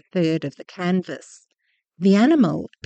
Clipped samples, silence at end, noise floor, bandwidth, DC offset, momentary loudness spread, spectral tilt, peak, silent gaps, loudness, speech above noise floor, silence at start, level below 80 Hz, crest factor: under 0.1%; 0.2 s; -71 dBFS; 8.6 kHz; under 0.1%; 18 LU; -7.5 dB/octave; -6 dBFS; none; -20 LUFS; 51 dB; 0.15 s; -66 dBFS; 16 dB